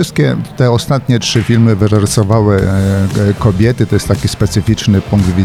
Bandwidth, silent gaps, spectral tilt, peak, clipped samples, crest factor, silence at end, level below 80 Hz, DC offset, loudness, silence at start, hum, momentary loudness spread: 14.5 kHz; none; -6 dB/octave; 0 dBFS; under 0.1%; 10 dB; 0 s; -30 dBFS; under 0.1%; -12 LUFS; 0 s; none; 3 LU